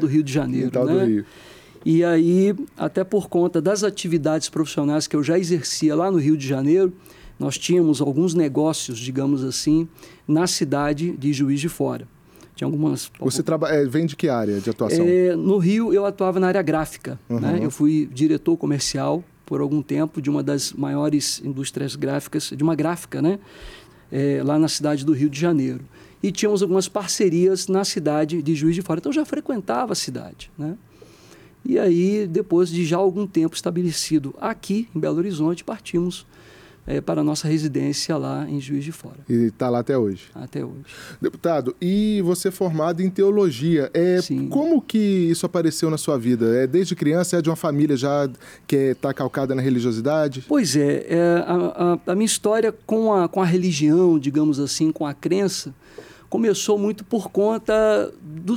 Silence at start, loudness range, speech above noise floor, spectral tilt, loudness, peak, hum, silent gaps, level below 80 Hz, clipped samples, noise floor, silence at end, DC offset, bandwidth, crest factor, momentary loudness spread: 0 s; 4 LU; 28 dB; -5.5 dB/octave; -21 LUFS; -8 dBFS; none; none; -54 dBFS; under 0.1%; -48 dBFS; 0 s; under 0.1%; 16 kHz; 12 dB; 9 LU